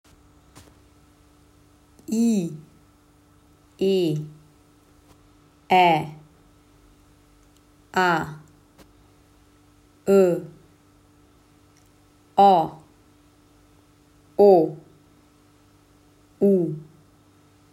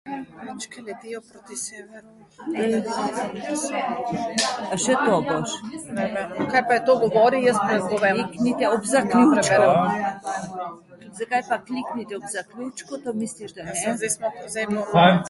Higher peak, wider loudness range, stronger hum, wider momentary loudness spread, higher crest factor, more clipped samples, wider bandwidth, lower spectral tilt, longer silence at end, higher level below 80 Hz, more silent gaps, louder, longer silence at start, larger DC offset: about the same, -4 dBFS vs -2 dBFS; about the same, 8 LU vs 10 LU; neither; first, 22 LU vs 18 LU; about the same, 22 dB vs 22 dB; neither; first, 15 kHz vs 12 kHz; first, -6 dB/octave vs -4.5 dB/octave; first, 0.9 s vs 0 s; about the same, -62 dBFS vs -60 dBFS; neither; about the same, -21 LUFS vs -22 LUFS; first, 2.1 s vs 0.05 s; neither